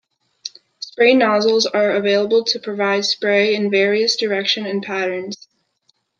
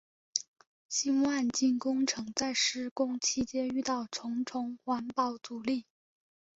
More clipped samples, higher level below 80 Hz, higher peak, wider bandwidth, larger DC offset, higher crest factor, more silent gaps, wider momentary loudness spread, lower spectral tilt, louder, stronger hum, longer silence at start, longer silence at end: neither; about the same, -70 dBFS vs -70 dBFS; first, -2 dBFS vs -8 dBFS; about the same, 7.4 kHz vs 8 kHz; neither; second, 18 dB vs 24 dB; second, none vs 0.48-0.54 s, 0.67-0.89 s, 2.91-2.96 s; first, 19 LU vs 7 LU; first, -3.5 dB/octave vs -2 dB/octave; first, -17 LUFS vs -32 LUFS; neither; about the same, 0.45 s vs 0.35 s; about the same, 0.85 s vs 0.75 s